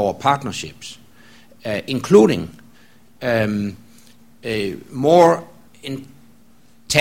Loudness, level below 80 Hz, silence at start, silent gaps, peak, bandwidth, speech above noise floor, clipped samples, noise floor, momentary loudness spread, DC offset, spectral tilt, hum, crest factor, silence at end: -18 LUFS; -52 dBFS; 0 s; none; 0 dBFS; 16.5 kHz; 36 dB; under 0.1%; -53 dBFS; 20 LU; 0.4%; -5 dB/octave; none; 20 dB; 0 s